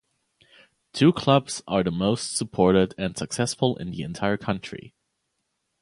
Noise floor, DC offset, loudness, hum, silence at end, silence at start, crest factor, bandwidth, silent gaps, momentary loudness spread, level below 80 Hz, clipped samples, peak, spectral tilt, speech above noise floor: -77 dBFS; under 0.1%; -24 LUFS; none; 0.95 s; 0.95 s; 22 dB; 11.5 kHz; none; 12 LU; -52 dBFS; under 0.1%; -2 dBFS; -5.5 dB/octave; 53 dB